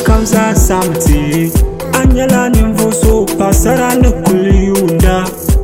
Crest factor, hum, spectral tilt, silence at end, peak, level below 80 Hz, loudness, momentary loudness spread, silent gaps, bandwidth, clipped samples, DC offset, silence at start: 10 dB; none; -5.5 dB/octave; 0 s; 0 dBFS; -14 dBFS; -11 LUFS; 3 LU; none; 16.5 kHz; 0.7%; 0.2%; 0 s